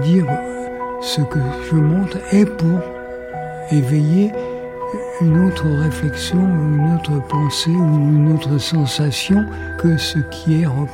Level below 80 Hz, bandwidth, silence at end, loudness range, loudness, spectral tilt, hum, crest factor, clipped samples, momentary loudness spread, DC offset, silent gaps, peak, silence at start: -40 dBFS; 15.5 kHz; 0 s; 2 LU; -17 LUFS; -6.5 dB/octave; none; 14 dB; under 0.1%; 11 LU; under 0.1%; none; -2 dBFS; 0 s